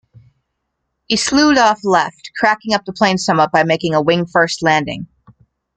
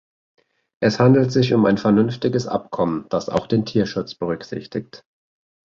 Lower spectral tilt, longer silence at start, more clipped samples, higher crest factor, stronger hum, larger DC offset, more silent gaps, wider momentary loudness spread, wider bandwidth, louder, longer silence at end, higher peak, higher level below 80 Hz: second, -4 dB/octave vs -7 dB/octave; first, 1.1 s vs 0.8 s; neither; about the same, 16 dB vs 18 dB; neither; neither; neither; second, 8 LU vs 13 LU; first, 9.4 kHz vs 7.6 kHz; first, -15 LUFS vs -20 LUFS; about the same, 0.7 s vs 0.8 s; about the same, 0 dBFS vs -2 dBFS; about the same, -50 dBFS vs -54 dBFS